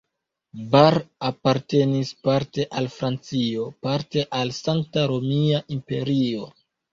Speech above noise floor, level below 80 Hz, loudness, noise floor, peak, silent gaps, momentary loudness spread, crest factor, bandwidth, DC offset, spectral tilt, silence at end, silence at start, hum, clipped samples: 59 dB; -58 dBFS; -23 LUFS; -81 dBFS; -2 dBFS; none; 10 LU; 22 dB; 7.6 kHz; under 0.1%; -6.5 dB/octave; 0.45 s; 0.55 s; none; under 0.1%